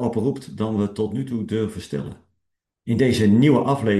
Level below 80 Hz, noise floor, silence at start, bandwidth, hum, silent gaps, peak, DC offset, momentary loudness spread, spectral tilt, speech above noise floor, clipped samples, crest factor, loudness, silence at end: -56 dBFS; -78 dBFS; 0 s; 12.5 kHz; none; none; -4 dBFS; under 0.1%; 14 LU; -7.5 dB/octave; 57 dB; under 0.1%; 16 dB; -21 LUFS; 0 s